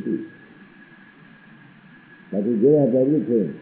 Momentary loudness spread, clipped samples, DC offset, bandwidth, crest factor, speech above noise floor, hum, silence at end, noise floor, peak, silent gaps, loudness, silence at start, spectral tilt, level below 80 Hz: 13 LU; under 0.1%; under 0.1%; 4 kHz; 16 dB; 30 dB; none; 0 s; -48 dBFS; -6 dBFS; none; -20 LUFS; 0 s; -10 dB/octave; -72 dBFS